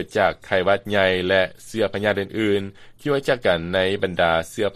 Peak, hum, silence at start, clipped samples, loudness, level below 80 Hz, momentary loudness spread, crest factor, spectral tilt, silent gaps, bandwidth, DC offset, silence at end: -2 dBFS; none; 0 s; under 0.1%; -21 LUFS; -50 dBFS; 6 LU; 18 dB; -5 dB/octave; none; 14 kHz; under 0.1%; 0 s